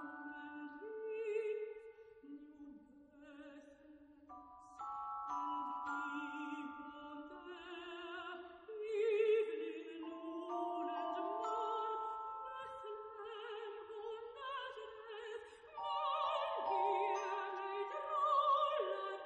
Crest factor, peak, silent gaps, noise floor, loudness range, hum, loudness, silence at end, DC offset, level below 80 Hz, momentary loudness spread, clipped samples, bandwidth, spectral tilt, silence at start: 18 dB; -24 dBFS; none; -62 dBFS; 10 LU; none; -42 LUFS; 0 s; under 0.1%; -82 dBFS; 21 LU; under 0.1%; 8.6 kHz; -3.5 dB/octave; 0 s